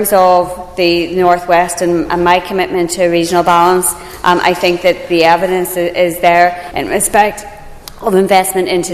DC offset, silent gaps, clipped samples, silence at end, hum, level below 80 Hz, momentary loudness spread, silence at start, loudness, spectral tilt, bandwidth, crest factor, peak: under 0.1%; none; 0.3%; 0 s; none; -38 dBFS; 7 LU; 0 s; -12 LUFS; -3.5 dB/octave; 14.5 kHz; 12 dB; 0 dBFS